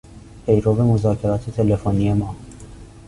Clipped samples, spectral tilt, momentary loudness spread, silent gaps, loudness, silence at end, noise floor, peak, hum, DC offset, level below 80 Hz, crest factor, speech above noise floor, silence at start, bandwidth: under 0.1%; -9.5 dB/octave; 14 LU; none; -19 LUFS; 0.05 s; -39 dBFS; -4 dBFS; none; under 0.1%; -38 dBFS; 16 dB; 22 dB; 0.1 s; 11 kHz